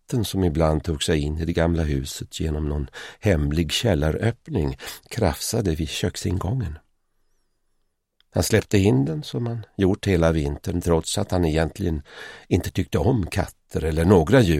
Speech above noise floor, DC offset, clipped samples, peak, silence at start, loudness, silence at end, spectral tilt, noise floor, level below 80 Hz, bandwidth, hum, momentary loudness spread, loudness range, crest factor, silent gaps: 48 dB; under 0.1%; under 0.1%; -2 dBFS; 0.1 s; -23 LUFS; 0 s; -6 dB/octave; -70 dBFS; -34 dBFS; 16 kHz; none; 9 LU; 5 LU; 20 dB; none